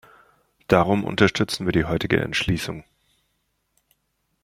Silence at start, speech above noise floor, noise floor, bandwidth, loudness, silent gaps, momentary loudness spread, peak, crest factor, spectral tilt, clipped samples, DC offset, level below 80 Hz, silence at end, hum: 0.7 s; 51 dB; -73 dBFS; 16 kHz; -22 LUFS; none; 8 LU; -2 dBFS; 22 dB; -5.5 dB/octave; under 0.1%; under 0.1%; -46 dBFS; 1.6 s; none